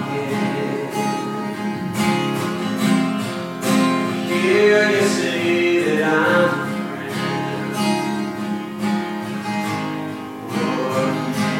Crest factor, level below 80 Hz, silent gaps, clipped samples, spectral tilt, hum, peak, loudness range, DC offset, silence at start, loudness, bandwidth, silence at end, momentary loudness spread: 16 dB; -64 dBFS; none; under 0.1%; -5 dB/octave; none; -2 dBFS; 6 LU; under 0.1%; 0 s; -20 LUFS; 16.5 kHz; 0 s; 10 LU